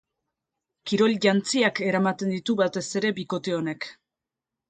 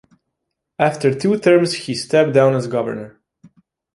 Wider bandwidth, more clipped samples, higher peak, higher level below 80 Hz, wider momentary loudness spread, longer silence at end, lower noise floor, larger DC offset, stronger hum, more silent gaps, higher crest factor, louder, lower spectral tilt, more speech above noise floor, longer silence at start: second, 9.6 kHz vs 11.5 kHz; neither; second, -6 dBFS vs -2 dBFS; second, -70 dBFS vs -60 dBFS; about the same, 10 LU vs 11 LU; about the same, 0.8 s vs 0.85 s; first, -88 dBFS vs -77 dBFS; neither; neither; neither; about the same, 20 dB vs 16 dB; second, -24 LUFS vs -17 LUFS; second, -4.5 dB/octave vs -6 dB/octave; about the same, 63 dB vs 61 dB; about the same, 0.85 s vs 0.8 s